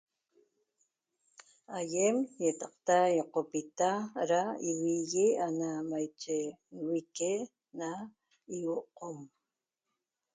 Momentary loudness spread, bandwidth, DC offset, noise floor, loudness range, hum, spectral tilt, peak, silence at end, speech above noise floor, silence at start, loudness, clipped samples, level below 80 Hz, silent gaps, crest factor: 15 LU; 9.6 kHz; under 0.1%; -89 dBFS; 8 LU; none; -4.5 dB/octave; -14 dBFS; 1.1 s; 56 dB; 1.4 s; -33 LUFS; under 0.1%; -82 dBFS; none; 20 dB